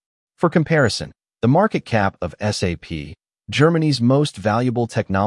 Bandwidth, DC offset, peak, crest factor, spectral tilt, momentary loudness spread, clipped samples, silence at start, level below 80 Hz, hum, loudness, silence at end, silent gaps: 12 kHz; under 0.1%; -4 dBFS; 16 dB; -6 dB/octave; 11 LU; under 0.1%; 0.4 s; -50 dBFS; none; -19 LUFS; 0 s; none